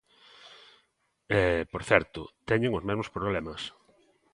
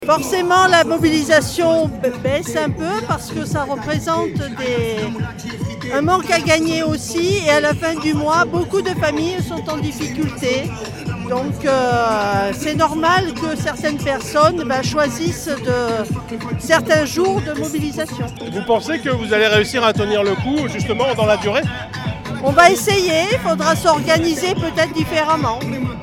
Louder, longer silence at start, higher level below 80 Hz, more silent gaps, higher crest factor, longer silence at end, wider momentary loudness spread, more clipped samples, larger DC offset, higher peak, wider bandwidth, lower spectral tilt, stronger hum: second, -28 LUFS vs -17 LUFS; first, 0.45 s vs 0 s; second, -50 dBFS vs -42 dBFS; neither; first, 28 dB vs 18 dB; first, 0.65 s vs 0 s; first, 17 LU vs 9 LU; neither; neither; second, -4 dBFS vs 0 dBFS; second, 11.5 kHz vs 17 kHz; first, -6 dB/octave vs -4.5 dB/octave; neither